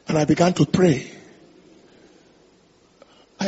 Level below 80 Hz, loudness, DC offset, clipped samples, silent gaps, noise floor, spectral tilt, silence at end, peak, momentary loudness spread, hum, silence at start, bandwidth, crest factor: -54 dBFS; -19 LUFS; under 0.1%; under 0.1%; none; -56 dBFS; -6.5 dB/octave; 0 s; -4 dBFS; 9 LU; none; 0.1 s; 8 kHz; 20 dB